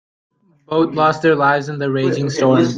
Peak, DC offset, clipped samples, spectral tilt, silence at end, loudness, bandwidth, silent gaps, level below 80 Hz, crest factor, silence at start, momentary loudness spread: -2 dBFS; under 0.1%; under 0.1%; -6.5 dB/octave; 0 s; -16 LUFS; 9.2 kHz; none; -60 dBFS; 16 dB; 0.7 s; 5 LU